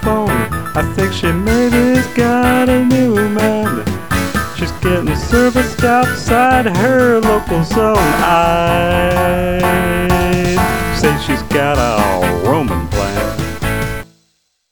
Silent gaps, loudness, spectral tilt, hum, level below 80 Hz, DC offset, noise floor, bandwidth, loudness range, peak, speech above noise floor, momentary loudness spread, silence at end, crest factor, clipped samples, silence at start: none; -14 LUFS; -5.5 dB/octave; none; -26 dBFS; 2%; -61 dBFS; over 20 kHz; 3 LU; 0 dBFS; 49 dB; 7 LU; 0 s; 14 dB; under 0.1%; 0 s